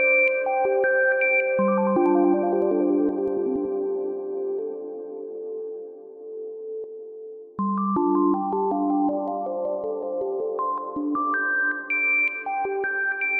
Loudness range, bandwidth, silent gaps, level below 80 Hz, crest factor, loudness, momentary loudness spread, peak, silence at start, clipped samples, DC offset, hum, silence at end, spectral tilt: 11 LU; 3.3 kHz; none; -68 dBFS; 14 dB; -23 LUFS; 15 LU; -10 dBFS; 0 s; under 0.1%; under 0.1%; none; 0 s; -10.5 dB/octave